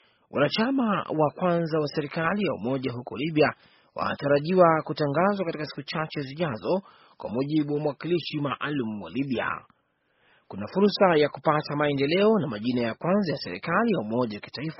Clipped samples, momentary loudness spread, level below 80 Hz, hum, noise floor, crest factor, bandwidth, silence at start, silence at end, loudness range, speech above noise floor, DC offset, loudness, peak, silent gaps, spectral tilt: under 0.1%; 11 LU; -64 dBFS; none; -70 dBFS; 20 dB; 6 kHz; 0.3 s; 0.05 s; 5 LU; 44 dB; under 0.1%; -26 LUFS; -6 dBFS; none; -5 dB/octave